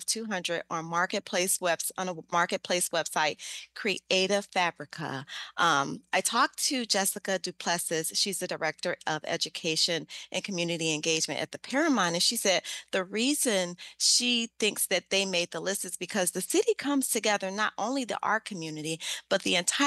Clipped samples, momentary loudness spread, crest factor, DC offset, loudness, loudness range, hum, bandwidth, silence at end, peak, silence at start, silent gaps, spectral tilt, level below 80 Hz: under 0.1%; 8 LU; 18 dB; under 0.1%; -28 LUFS; 3 LU; none; 12.5 kHz; 0 s; -10 dBFS; 0 s; none; -2 dB/octave; -78 dBFS